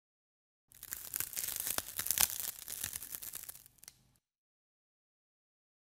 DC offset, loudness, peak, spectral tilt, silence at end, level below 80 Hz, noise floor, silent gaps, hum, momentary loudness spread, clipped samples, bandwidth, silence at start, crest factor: under 0.1%; -36 LUFS; -2 dBFS; 0.5 dB/octave; 2 s; -68 dBFS; -72 dBFS; none; none; 23 LU; under 0.1%; 17 kHz; 0.75 s; 40 dB